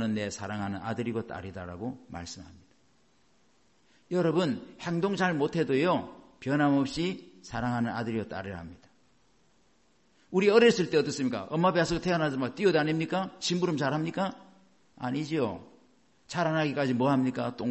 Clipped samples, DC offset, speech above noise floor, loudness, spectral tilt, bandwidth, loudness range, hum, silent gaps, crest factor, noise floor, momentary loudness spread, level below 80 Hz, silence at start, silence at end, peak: under 0.1%; under 0.1%; 39 dB; -29 LUFS; -6 dB/octave; 8.4 kHz; 10 LU; none; none; 22 dB; -68 dBFS; 14 LU; -58 dBFS; 0 s; 0 s; -8 dBFS